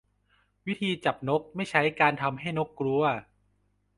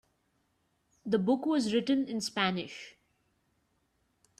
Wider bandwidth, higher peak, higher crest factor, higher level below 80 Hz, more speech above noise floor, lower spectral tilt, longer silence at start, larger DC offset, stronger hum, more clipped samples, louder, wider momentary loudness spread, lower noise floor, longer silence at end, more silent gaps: second, 11.5 kHz vs 13 kHz; first, -6 dBFS vs -14 dBFS; about the same, 24 dB vs 20 dB; first, -66 dBFS vs -74 dBFS; about the same, 43 dB vs 45 dB; about the same, -6 dB/octave vs -5 dB/octave; second, 0.65 s vs 1.05 s; neither; first, 50 Hz at -55 dBFS vs none; neither; about the same, -28 LUFS vs -30 LUFS; second, 8 LU vs 17 LU; second, -71 dBFS vs -76 dBFS; second, 0.75 s vs 1.5 s; neither